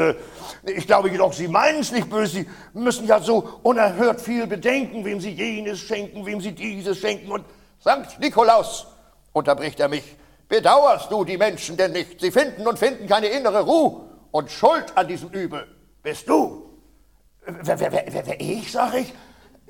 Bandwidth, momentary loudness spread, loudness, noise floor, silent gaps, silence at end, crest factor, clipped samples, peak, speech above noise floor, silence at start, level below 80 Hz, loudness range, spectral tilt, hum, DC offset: 17.5 kHz; 13 LU; -21 LUFS; -57 dBFS; none; 0.5 s; 18 dB; under 0.1%; -2 dBFS; 36 dB; 0 s; -56 dBFS; 6 LU; -4.5 dB/octave; none; under 0.1%